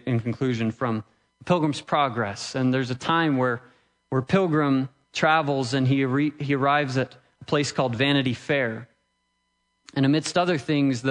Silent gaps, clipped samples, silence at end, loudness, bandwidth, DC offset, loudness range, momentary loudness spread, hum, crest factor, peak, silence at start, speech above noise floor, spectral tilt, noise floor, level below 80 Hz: none; under 0.1%; 0 s; -24 LUFS; 10.5 kHz; under 0.1%; 2 LU; 7 LU; none; 18 dB; -8 dBFS; 0.05 s; 50 dB; -6 dB/octave; -73 dBFS; -64 dBFS